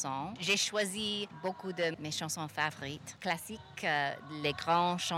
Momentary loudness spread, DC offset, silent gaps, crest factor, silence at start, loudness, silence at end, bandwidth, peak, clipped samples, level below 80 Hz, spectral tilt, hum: 9 LU; under 0.1%; none; 18 dB; 0 s; -34 LUFS; 0 s; 16 kHz; -16 dBFS; under 0.1%; -70 dBFS; -3 dB/octave; none